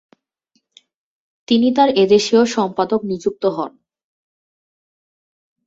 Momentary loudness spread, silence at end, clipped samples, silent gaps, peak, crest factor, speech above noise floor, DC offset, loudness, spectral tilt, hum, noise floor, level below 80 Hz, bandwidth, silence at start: 9 LU; 1.95 s; under 0.1%; none; -2 dBFS; 18 dB; 52 dB; under 0.1%; -16 LUFS; -5 dB/octave; none; -67 dBFS; -62 dBFS; 8 kHz; 1.5 s